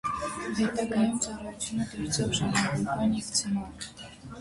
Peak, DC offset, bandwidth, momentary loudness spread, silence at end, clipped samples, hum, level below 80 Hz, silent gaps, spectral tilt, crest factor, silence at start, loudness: -12 dBFS; under 0.1%; 11.5 kHz; 13 LU; 0 s; under 0.1%; none; -52 dBFS; none; -4 dB/octave; 18 dB; 0.05 s; -29 LUFS